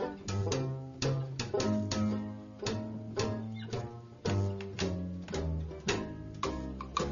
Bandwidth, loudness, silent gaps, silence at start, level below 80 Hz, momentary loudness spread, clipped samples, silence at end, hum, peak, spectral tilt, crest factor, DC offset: 7.4 kHz; -36 LUFS; none; 0 s; -48 dBFS; 7 LU; under 0.1%; 0 s; none; -18 dBFS; -5.5 dB/octave; 18 dB; under 0.1%